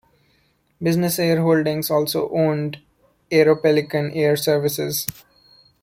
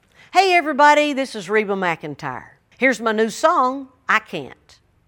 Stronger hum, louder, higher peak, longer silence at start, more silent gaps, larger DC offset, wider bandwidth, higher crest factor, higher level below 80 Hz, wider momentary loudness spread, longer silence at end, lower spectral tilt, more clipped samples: neither; about the same, -20 LUFS vs -18 LUFS; about the same, 0 dBFS vs 0 dBFS; first, 0.8 s vs 0.35 s; neither; neither; about the same, 16.5 kHz vs 17.5 kHz; about the same, 20 dB vs 20 dB; about the same, -60 dBFS vs -64 dBFS; second, 9 LU vs 17 LU; first, 0.7 s vs 0.55 s; first, -5.5 dB/octave vs -3.5 dB/octave; neither